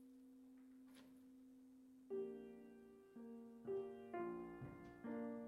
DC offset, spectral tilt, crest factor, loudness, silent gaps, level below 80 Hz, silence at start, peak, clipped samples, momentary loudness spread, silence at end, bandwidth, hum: under 0.1%; -8 dB/octave; 16 dB; -53 LUFS; none; -82 dBFS; 0 s; -38 dBFS; under 0.1%; 16 LU; 0 s; 14.5 kHz; none